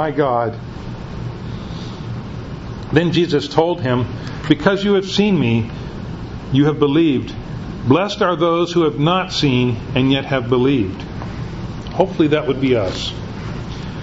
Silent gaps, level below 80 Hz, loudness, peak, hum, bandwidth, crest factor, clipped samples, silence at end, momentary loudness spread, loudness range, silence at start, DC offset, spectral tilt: none; -38 dBFS; -18 LUFS; 0 dBFS; none; 8 kHz; 18 dB; under 0.1%; 0 s; 14 LU; 4 LU; 0 s; under 0.1%; -6.5 dB/octave